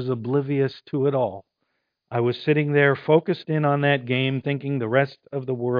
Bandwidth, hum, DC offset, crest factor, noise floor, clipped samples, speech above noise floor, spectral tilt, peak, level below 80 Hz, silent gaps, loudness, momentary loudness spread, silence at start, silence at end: 5.2 kHz; none; under 0.1%; 18 dB; -76 dBFS; under 0.1%; 53 dB; -9.5 dB/octave; -4 dBFS; -72 dBFS; none; -23 LUFS; 8 LU; 0 s; 0 s